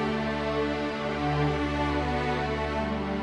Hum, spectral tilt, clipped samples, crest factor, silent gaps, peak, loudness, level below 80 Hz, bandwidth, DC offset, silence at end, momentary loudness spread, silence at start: none; -6.5 dB/octave; under 0.1%; 12 dB; none; -16 dBFS; -28 LUFS; -40 dBFS; 11 kHz; under 0.1%; 0 s; 3 LU; 0 s